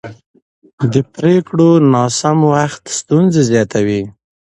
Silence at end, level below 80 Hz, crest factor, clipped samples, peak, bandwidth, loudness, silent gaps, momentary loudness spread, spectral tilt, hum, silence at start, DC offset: 0.4 s; -50 dBFS; 14 dB; under 0.1%; 0 dBFS; 11.5 kHz; -13 LUFS; 0.26-0.34 s, 0.42-0.62 s, 0.73-0.78 s; 9 LU; -6 dB/octave; none; 0.05 s; under 0.1%